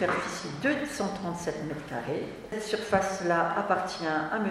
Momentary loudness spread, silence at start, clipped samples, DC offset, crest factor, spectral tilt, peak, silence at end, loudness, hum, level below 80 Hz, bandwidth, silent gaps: 8 LU; 0 s; under 0.1%; under 0.1%; 22 dB; -4.5 dB/octave; -8 dBFS; 0 s; -30 LUFS; none; -58 dBFS; 15 kHz; none